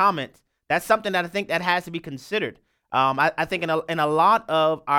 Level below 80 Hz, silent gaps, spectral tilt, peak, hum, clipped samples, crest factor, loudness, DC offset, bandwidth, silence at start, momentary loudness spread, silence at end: -62 dBFS; none; -4.5 dB/octave; -4 dBFS; none; under 0.1%; 18 dB; -22 LUFS; under 0.1%; 17.5 kHz; 0 s; 12 LU; 0 s